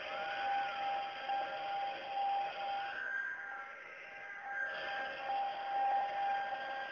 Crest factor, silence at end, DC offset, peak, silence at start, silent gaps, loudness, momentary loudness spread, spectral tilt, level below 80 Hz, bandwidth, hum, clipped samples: 12 dB; 0 s; under 0.1%; -26 dBFS; 0 s; none; -39 LUFS; 10 LU; 2 dB/octave; -80 dBFS; 6.8 kHz; none; under 0.1%